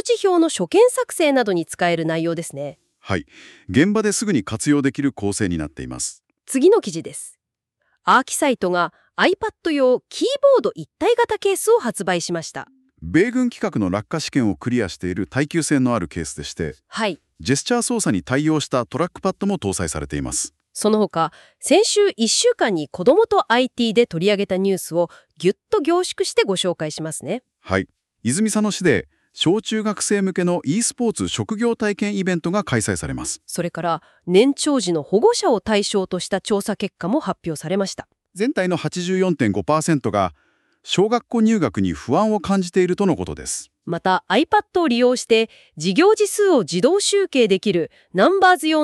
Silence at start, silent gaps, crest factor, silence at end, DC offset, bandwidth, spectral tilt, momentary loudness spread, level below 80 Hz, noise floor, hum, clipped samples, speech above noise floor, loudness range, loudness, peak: 0.05 s; none; 16 dB; 0 s; under 0.1%; 13.5 kHz; -4.5 dB/octave; 10 LU; -50 dBFS; -76 dBFS; none; under 0.1%; 57 dB; 4 LU; -20 LUFS; -4 dBFS